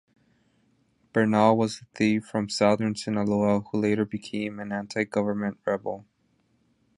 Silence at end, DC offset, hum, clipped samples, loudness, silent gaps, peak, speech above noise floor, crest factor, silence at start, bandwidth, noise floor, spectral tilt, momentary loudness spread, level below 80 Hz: 0.95 s; under 0.1%; none; under 0.1%; -26 LUFS; none; -6 dBFS; 43 dB; 20 dB; 1.15 s; 11.5 kHz; -68 dBFS; -6 dB/octave; 10 LU; -62 dBFS